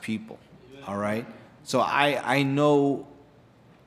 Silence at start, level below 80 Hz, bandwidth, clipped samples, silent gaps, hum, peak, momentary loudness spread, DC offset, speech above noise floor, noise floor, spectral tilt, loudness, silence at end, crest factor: 0 s; -68 dBFS; 14.5 kHz; under 0.1%; none; none; -6 dBFS; 22 LU; under 0.1%; 30 dB; -55 dBFS; -5.5 dB/octave; -25 LUFS; 0.75 s; 20 dB